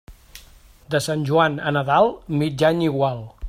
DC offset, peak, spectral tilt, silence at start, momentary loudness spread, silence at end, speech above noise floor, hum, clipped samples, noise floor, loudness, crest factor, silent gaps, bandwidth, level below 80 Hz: under 0.1%; -2 dBFS; -6 dB/octave; 0.1 s; 6 LU; 0 s; 28 dB; none; under 0.1%; -48 dBFS; -20 LUFS; 18 dB; none; 15.5 kHz; -50 dBFS